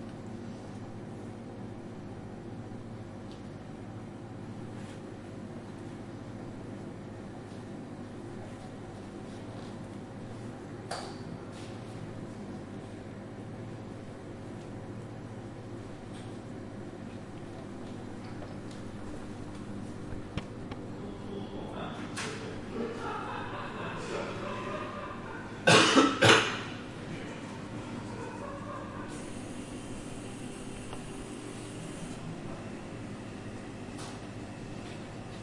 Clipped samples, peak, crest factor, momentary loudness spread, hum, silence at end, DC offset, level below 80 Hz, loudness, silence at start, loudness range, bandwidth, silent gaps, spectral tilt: under 0.1%; -6 dBFS; 30 dB; 7 LU; 50 Hz at -50 dBFS; 0 s; under 0.1%; -56 dBFS; -36 LUFS; 0 s; 17 LU; 11.5 kHz; none; -4 dB/octave